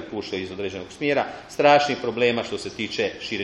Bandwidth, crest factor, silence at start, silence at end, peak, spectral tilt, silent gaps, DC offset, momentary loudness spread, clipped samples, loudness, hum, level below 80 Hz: 11.5 kHz; 20 dB; 0 s; 0 s; -4 dBFS; -4.5 dB/octave; none; under 0.1%; 13 LU; under 0.1%; -23 LUFS; none; -58 dBFS